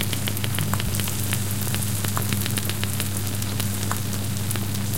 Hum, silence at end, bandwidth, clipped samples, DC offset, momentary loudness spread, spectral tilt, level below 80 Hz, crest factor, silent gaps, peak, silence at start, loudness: none; 0 s; 17 kHz; under 0.1%; 3%; 2 LU; -4 dB/octave; -42 dBFS; 22 dB; none; -2 dBFS; 0 s; -25 LUFS